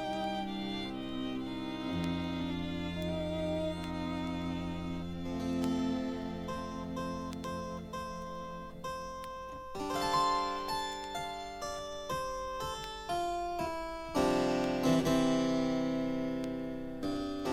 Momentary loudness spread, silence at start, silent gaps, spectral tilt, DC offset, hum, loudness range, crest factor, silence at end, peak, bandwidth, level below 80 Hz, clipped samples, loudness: 11 LU; 0 s; none; -5.5 dB/octave; under 0.1%; none; 7 LU; 18 dB; 0 s; -16 dBFS; 15.5 kHz; -54 dBFS; under 0.1%; -36 LUFS